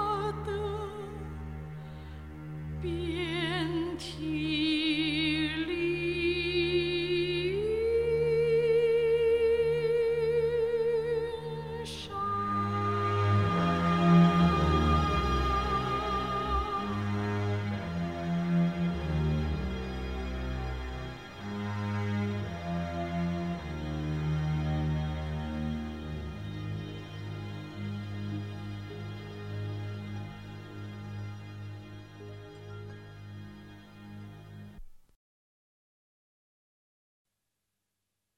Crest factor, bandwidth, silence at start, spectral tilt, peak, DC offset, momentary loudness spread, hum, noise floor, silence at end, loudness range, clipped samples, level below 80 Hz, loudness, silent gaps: 20 dB; 11.5 kHz; 0 s; -7 dB/octave; -12 dBFS; 0.1%; 18 LU; none; -85 dBFS; 3.35 s; 17 LU; under 0.1%; -44 dBFS; -31 LUFS; none